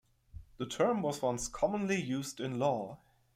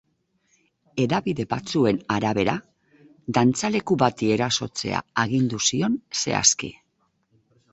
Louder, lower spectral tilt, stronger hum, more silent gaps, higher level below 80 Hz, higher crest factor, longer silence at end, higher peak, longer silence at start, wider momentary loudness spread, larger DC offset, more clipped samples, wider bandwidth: second, -34 LUFS vs -23 LUFS; about the same, -5 dB/octave vs -4 dB/octave; neither; neither; about the same, -60 dBFS vs -56 dBFS; about the same, 18 dB vs 22 dB; second, 0.4 s vs 1 s; second, -18 dBFS vs -2 dBFS; second, 0.35 s vs 0.95 s; about the same, 9 LU vs 8 LU; neither; neither; first, 16 kHz vs 8.4 kHz